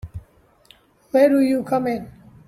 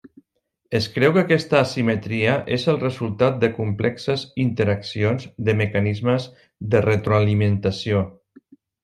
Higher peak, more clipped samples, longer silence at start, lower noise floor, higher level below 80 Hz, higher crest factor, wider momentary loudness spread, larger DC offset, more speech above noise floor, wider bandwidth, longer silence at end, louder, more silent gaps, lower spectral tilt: about the same, -4 dBFS vs -2 dBFS; neither; second, 0.05 s vs 0.7 s; second, -54 dBFS vs -73 dBFS; first, -50 dBFS vs -56 dBFS; about the same, 18 dB vs 18 dB; first, 24 LU vs 7 LU; neither; second, 36 dB vs 53 dB; first, 14 kHz vs 10 kHz; second, 0.35 s vs 0.7 s; about the same, -19 LUFS vs -21 LUFS; neither; about the same, -7 dB/octave vs -7 dB/octave